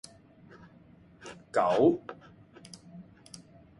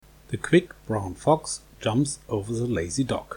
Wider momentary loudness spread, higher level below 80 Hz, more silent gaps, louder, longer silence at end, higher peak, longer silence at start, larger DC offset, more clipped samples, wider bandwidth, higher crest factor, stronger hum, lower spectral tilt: first, 27 LU vs 9 LU; second, -68 dBFS vs -50 dBFS; neither; about the same, -27 LUFS vs -26 LUFS; first, 0.8 s vs 0 s; second, -12 dBFS vs -6 dBFS; first, 1.25 s vs 0.3 s; neither; neither; second, 11.5 kHz vs 18.5 kHz; about the same, 22 dB vs 20 dB; neither; about the same, -6 dB/octave vs -5.5 dB/octave